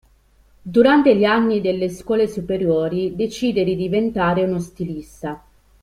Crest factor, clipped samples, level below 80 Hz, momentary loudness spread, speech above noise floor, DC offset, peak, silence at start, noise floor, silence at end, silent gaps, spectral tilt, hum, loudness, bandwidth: 18 dB; under 0.1%; -48 dBFS; 16 LU; 36 dB; under 0.1%; -2 dBFS; 0.65 s; -55 dBFS; 0.45 s; none; -6.5 dB/octave; none; -19 LUFS; 14.5 kHz